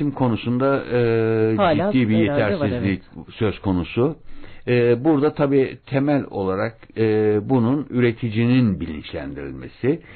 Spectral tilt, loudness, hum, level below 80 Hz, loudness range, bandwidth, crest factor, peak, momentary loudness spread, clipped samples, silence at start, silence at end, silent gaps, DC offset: -12.5 dB/octave; -20 LUFS; none; -44 dBFS; 2 LU; 4.5 kHz; 12 dB; -8 dBFS; 11 LU; under 0.1%; 0 s; 0 s; none; under 0.1%